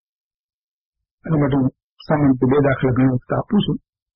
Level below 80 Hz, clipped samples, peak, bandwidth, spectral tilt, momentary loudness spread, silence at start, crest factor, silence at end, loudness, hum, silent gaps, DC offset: -44 dBFS; under 0.1%; -6 dBFS; 5.4 kHz; -7 dB/octave; 8 LU; 1.25 s; 14 dB; 0.4 s; -19 LUFS; none; 1.83-1.97 s; under 0.1%